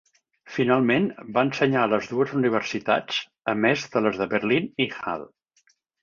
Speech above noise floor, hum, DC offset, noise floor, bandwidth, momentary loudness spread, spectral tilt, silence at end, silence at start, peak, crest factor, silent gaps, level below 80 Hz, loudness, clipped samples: 42 dB; none; under 0.1%; -66 dBFS; 7.4 kHz; 7 LU; -5.5 dB/octave; 0.8 s; 0.45 s; -6 dBFS; 18 dB; none; -64 dBFS; -24 LUFS; under 0.1%